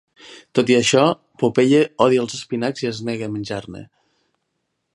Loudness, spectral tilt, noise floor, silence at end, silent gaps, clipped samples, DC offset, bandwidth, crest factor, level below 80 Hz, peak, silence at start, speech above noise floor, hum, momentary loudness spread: -19 LUFS; -5 dB/octave; -74 dBFS; 1.1 s; none; under 0.1%; under 0.1%; 11 kHz; 20 dB; -60 dBFS; 0 dBFS; 0.25 s; 56 dB; none; 13 LU